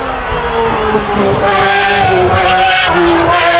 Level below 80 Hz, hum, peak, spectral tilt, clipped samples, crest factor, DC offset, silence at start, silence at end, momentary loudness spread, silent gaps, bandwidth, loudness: -30 dBFS; none; 0 dBFS; -9 dB/octave; under 0.1%; 10 dB; under 0.1%; 0 s; 0 s; 5 LU; none; 4 kHz; -10 LUFS